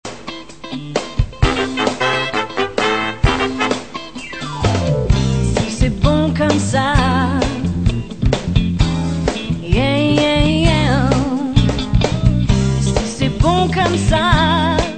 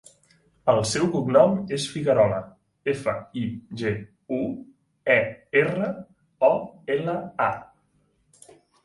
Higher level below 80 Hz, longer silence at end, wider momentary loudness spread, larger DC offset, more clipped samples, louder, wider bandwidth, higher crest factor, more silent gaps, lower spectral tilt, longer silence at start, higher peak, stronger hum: first, -24 dBFS vs -58 dBFS; second, 0 s vs 1.2 s; about the same, 9 LU vs 11 LU; first, 1% vs under 0.1%; neither; first, -16 LUFS vs -24 LUFS; second, 9.2 kHz vs 11.5 kHz; about the same, 16 dB vs 20 dB; neither; about the same, -5.5 dB/octave vs -5.5 dB/octave; second, 0.05 s vs 0.65 s; first, 0 dBFS vs -4 dBFS; neither